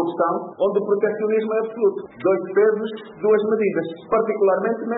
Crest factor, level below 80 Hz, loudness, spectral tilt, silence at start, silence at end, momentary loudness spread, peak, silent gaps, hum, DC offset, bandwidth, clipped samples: 12 dB; -64 dBFS; -21 LUFS; -11.5 dB/octave; 0 s; 0 s; 6 LU; -8 dBFS; none; none; under 0.1%; 4 kHz; under 0.1%